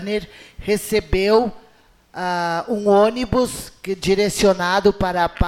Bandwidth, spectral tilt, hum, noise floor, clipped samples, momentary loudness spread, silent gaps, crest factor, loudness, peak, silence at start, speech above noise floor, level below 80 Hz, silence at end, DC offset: 16.5 kHz; -5 dB/octave; none; -53 dBFS; under 0.1%; 12 LU; none; 16 dB; -19 LUFS; -4 dBFS; 0 s; 34 dB; -38 dBFS; 0 s; under 0.1%